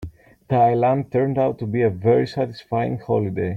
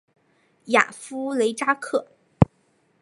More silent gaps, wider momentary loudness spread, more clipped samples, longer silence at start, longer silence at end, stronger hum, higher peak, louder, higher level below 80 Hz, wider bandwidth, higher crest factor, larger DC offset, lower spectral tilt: neither; about the same, 7 LU vs 8 LU; neither; second, 0 s vs 0.65 s; second, 0 s vs 0.6 s; neither; second, -6 dBFS vs 0 dBFS; about the same, -21 LUFS vs -23 LUFS; second, -52 dBFS vs -44 dBFS; second, 7.6 kHz vs 11.5 kHz; second, 14 dB vs 24 dB; neither; first, -9 dB/octave vs -5.5 dB/octave